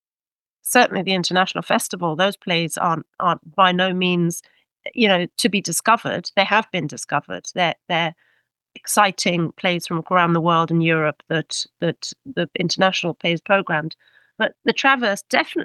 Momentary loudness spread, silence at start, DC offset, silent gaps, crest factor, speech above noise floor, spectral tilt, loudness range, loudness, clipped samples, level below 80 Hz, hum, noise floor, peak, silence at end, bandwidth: 9 LU; 0.65 s; under 0.1%; none; 20 dB; over 70 dB; -4 dB/octave; 2 LU; -20 LUFS; under 0.1%; -70 dBFS; none; under -90 dBFS; -2 dBFS; 0 s; 12.5 kHz